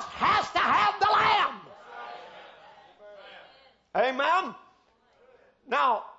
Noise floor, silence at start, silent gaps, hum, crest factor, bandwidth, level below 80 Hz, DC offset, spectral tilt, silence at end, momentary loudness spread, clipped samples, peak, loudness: -64 dBFS; 0 s; none; none; 16 dB; 8 kHz; -64 dBFS; under 0.1%; -3 dB/octave; 0.05 s; 23 LU; under 0.1%; -12 dBFS; -25 LUFS